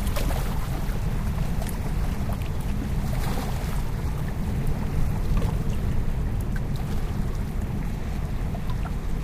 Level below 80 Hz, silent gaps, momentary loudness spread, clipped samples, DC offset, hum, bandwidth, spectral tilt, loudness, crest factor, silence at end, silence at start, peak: -28 dBFS; none; 3 LU; under 0.1%; under 0.1%; none; 15.5 kHz; -6.5 dB/octave; -29 LUFS; 14 dB; 0 s; 0 s; -12 dBFS